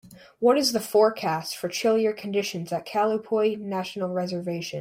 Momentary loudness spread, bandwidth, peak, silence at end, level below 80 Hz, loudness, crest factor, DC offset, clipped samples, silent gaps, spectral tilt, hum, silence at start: 9 LU; 16 kHz; -8 dBFS; 0 s; -72 dBFS; -25 LUFS; 16 dB; under 0.1%; under 0.1%; none; -4.5 dB/octave; none; 0.05 s